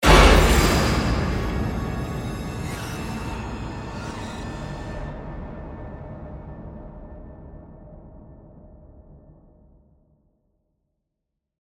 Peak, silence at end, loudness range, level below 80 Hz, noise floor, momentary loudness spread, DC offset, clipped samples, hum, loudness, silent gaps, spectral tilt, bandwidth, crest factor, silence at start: -2 dBFS; 2.4 s; 23 LU; -28 dBFS; -81 dBFS; 25 LU; under 0.1%; under 0.1%; none; -23 LUFS; none; -5 dB/octave; 16 kHz; 22 dB; 0 s